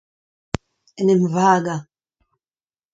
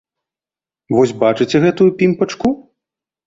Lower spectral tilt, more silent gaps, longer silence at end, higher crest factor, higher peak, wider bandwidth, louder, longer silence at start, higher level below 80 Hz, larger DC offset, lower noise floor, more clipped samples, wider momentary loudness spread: about the same, -6.5 dB/octave vs -6.5 dB/octave; neither; first, 1.1 s vs 0.7 s; first, 22 dB vs 16 dB; about the same, 0 dBFS vs -2 dBFS; about the same, 7.8 kHz vs 7.8 kHz; second, -18 LUFS vs -15 LUFS; about the same, 1 s vs 0.9 s; about the same, -48 dBFS vs -52 dBFS; neither; about the same, under -90 dBFS vs under -90 dBFS; neither; first, 14 LU vs 6 LU